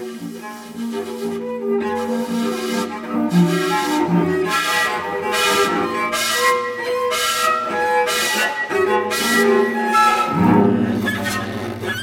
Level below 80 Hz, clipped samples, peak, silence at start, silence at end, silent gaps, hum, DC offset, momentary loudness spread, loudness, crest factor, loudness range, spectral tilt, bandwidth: -56 dBFS; under 0.1%; -2 dBFS; 0 s; 0 s; none; none; under 0.1%; 11 LU; -18 LUFS; 16 dB; 4 LU; -4 dB/octave; 17.5 kHz